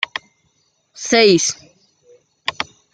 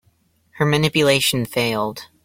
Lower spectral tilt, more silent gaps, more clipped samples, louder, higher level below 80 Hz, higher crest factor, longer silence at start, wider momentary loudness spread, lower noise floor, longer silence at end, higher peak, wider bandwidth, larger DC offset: second, -2.5 dB/octave vs -4.5 dB/octave; neither; neither; about the same, -16 LUFS vs -18 LUFS; second, -62 dBFS vs -52 dBFS; about the same, 20 dB vs 16 dB; second, 0 s vs 0.55 s; first, 18 LU vs 8 LU; about the same, -63 dBFS vs -61 dBFS; about the same, 0.3 s vs 0.2 s; first, 0 dBFS vs -4 dBFS; second, 10 kHz vs 16.5 kHz; neither